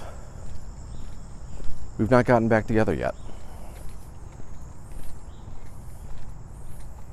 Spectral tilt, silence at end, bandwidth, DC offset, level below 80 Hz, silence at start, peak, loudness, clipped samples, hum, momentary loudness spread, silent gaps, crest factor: -7.5 dB/octave; 0 s; 12.5 kHz; under 0.1%; -40 dBFS; 0 s; -4 dBFS; -23 LUFS; under 0.1%; none; 23 LU; none; 20 dB